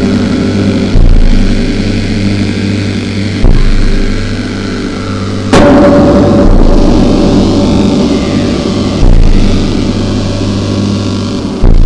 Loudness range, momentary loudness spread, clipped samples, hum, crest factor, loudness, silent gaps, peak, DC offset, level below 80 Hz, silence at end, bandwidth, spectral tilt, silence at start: 5 LU; 9 LU; 0.5%; none; 6 dB; -9 LUFS; none; 0 dBFS; under 0.1%; -10 dBFS; 0 s; 10 kHz; -6.5 dB/octave; 0 s